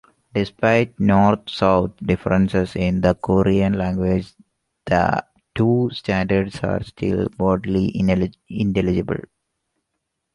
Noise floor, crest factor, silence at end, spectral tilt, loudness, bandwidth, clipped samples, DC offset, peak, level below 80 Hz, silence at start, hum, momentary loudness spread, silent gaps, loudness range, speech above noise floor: -77 dBFS; 18 dB; 1.15 s; -8 dB/octave; -20 LUFS; 10.5 kHz; under 0.1%; under 0.1%; -2 dBFS; -40 dBFS; 0.35 s; none; 7 LU; none; 3 LU; 58 dB